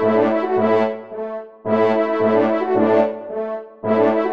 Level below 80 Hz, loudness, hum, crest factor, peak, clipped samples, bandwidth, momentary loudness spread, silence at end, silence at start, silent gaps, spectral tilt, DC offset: -66 dBFS; -19 LUFS; none; 14 dB; -4 dBFS; under 0.1%; 6.2 kHz; 12 LU; 0 s; 0 s; none; -8 dB/octave; 0.3%